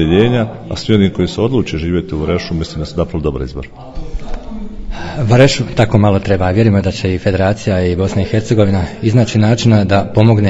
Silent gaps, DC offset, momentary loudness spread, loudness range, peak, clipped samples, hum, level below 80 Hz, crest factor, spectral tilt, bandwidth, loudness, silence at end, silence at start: none; under 0.1%; 17 LU; 7 LU; 0 dBFS; 0.4%; none; -30 dBFS; 12 dB; -7 dB/octave; 8 kHz; -14 LUFS; 0 s; 0 s